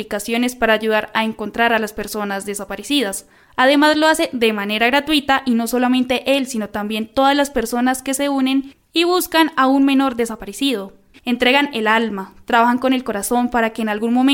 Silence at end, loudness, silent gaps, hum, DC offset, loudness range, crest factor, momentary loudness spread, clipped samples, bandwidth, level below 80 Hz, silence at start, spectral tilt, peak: 0 s; -17 LUFS; none; none; under 0.1%; 2 LU; 16 dB; 9 LU; under 0.1%; 17 kHz; -48 dBFS; 0 s; -3 dB/octave; -2 dBFS